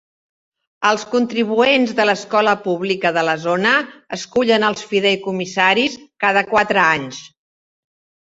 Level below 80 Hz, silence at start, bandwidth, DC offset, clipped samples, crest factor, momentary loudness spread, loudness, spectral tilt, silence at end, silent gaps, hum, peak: -60 dBFS; 0.8 s; 8 kHz; under 0.1%; under 0.1%; 18 dB; 7 LU; -17 LUFS; -4 dB/octave; 1.05 s; none; none; -2 dBFS